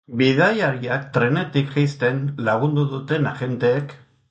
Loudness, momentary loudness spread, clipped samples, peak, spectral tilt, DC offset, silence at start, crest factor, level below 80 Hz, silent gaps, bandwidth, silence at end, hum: -21 LUFS; 6 LU; under 0.1%; -4 dBFS; -7.5 dB/octave; under 0.1%; 0.1 s; 16 dB; -60 dBFS; none; 7.8 kHz; 0.35 s; none